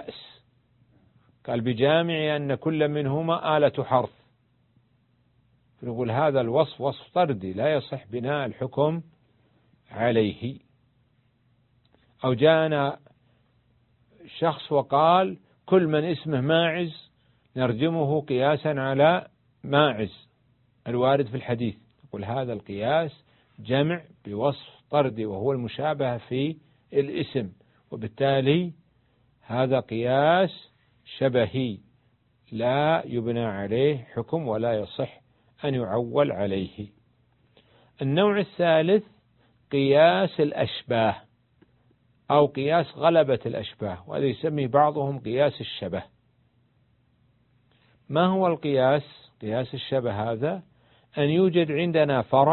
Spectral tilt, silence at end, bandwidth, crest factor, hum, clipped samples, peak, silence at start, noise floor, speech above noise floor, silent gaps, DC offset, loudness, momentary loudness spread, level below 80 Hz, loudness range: -11 dB/octave; 0 s; 4.3 kHz; 22 dB; none; under 0.1%; -4 dBFS; 0 s; -66 dBFS; 42 dB; none; under 0.1%; -25 LUFS; 14 LU; -60 dBFS; 5 LU